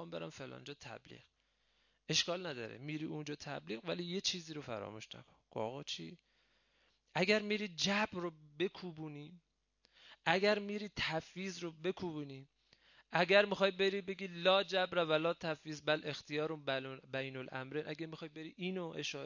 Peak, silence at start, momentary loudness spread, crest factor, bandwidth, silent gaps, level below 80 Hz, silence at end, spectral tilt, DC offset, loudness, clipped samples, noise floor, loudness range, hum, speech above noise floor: -14 dBFS; 0 s; 17 LU; 26 dB; 7.4 kHz; none; -74 dBFS; 0 s; -4 dB/octave; under 0.1%; -37 LUFS; under 0.1%; -77 dBFS; 8 LU; none; 39 dB